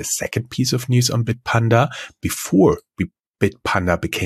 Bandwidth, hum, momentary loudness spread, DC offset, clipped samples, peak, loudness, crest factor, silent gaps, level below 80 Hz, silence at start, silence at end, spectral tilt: 14.5 kHz; none; 10 LU; under 0.1%; under 0.1%; -2 dBFS; -19 LUFS; 18 dB; 3.20-3.34 s; -44 dBFS; 0 s; 0 s; -5 dB/octave